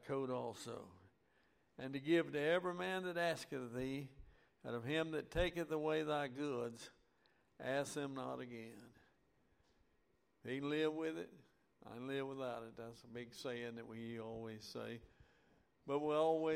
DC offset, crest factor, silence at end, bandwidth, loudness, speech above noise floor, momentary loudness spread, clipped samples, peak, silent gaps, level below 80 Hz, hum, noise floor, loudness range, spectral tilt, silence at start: under 0.1%; 20 dB; 0 s; 16 kHz; -43 LUFS; 37 dB; 17 LU; under 0.1%; -24 dBFS; none; -64 dBFS; none; -79 dBFS; 7 LU; -5.5 dB/octave; 0 s